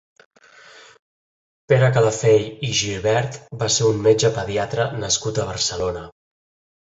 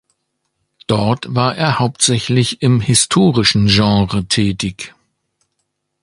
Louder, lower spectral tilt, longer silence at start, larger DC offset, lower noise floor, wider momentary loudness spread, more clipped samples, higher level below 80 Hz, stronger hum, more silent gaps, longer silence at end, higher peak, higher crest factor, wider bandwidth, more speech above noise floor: second, -20 LUFS vs -14 LUFS; about the same, -4 dB/octave vs -4.5 dB/octave; second, 0.75 s vs 0.9 s; neither; second, -47 dBFS vs -71 dBFS; about the same, 9 LU vs 10 LU; neither; second, -48 dBFS vs -40 dBFS; neither; first, 0.99-1.68 s vs none; second, 0.8 s vs 1.15 s; about the same, -2 dBFS vs 0 dBFS; about the same, 20 dB vs 16 dB; second, 8 kHz vs 11.5 kHz; second, 28 dB vs 57 dB